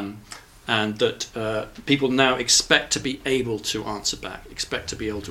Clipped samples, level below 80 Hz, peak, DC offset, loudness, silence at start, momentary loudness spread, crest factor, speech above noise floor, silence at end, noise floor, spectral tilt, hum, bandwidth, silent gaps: under 0.1%; -48 dBFS; 0 dBFS; under 0.1%; -23 LUFS; 0 s; 16 LU; 24 dB; 20 dB; 0 s; -44 dBFS; -2.5 dB/octave; none; 16.5 kHz; none